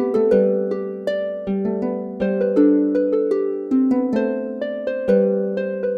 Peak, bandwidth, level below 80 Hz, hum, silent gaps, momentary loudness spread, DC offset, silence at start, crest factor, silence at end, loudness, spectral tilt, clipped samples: -4 dBFS; 6.4 kHz; -56 dBFS; none; none; 8 LU; under 0.1%; 0 s; 14 dB; 0 s; -20 LUFS; -9 dB/octave; under 0.1%